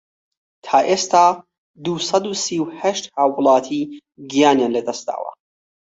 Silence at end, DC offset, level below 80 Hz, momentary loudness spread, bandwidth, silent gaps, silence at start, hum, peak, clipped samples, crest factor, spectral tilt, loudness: 0.6 s; under 0.1%; -66 dBFS; 15 LU; 8 kHz; 1.58-1.74 s; 0.65 s; none; -2 dBFS; under 0.1%; 18 dB; -3.5 dB/octave; -18 LUFS